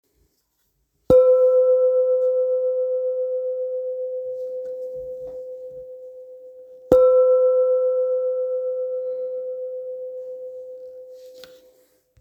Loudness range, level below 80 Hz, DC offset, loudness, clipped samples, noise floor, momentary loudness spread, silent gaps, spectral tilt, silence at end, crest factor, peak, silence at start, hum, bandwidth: 12 LU; -54 dBFS; under 0.1%; -20 LUFS; under 0.1%; -70 dBFS; 23 LU; none; -8 dB/octave; 0.75 s; 22 dB; 0 dBFS; 1.1 s; none; 4.1 kHz